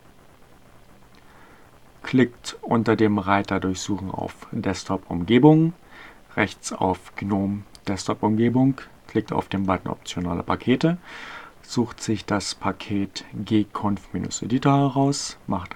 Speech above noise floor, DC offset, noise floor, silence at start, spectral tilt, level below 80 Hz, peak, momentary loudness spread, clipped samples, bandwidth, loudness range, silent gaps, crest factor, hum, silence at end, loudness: 29 dB; 0.2%; -52 dBFS; 2.05 s; -6 dB/octave; -52 dBFS; -2 dBFS; 12 LU; under 0.1%; 13.5 kHz; 4 LU; none; 22 dB; none; 0 s; -24 LUFS